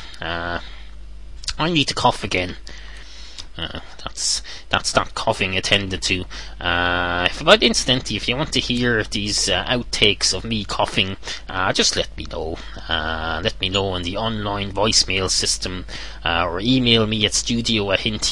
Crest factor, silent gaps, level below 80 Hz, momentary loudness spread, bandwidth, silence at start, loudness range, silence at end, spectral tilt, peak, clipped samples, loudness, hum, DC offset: 22 dB; none; -36 dBFS; 14 LU; 11.5 kHz; 0 s; 6 LU; 0 s; -3 dB/octave; 0 dBFS; under 0.1%; -20 LUFS; none; 1%